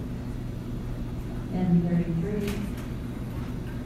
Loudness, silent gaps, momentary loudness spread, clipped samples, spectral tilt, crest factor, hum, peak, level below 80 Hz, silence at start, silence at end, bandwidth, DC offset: -30 LUFS; none; 11 LU; under 0.1%; -8 dB/octave; 16 dB; none; -14 dBFS; -38 dBFS; 0 s; 0 s; 14.5 kHz; under 0.1%